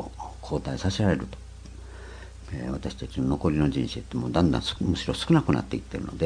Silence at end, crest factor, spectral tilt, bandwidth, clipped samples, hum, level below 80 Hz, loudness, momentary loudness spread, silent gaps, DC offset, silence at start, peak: 0 s; 20 dB; -6.5 dB/octave; 10.5 kHz; under 0.1%; none; -40 dBFS; -27 LUFS; 20 LU; none; under 0.1%; 0 s; -6 dBFS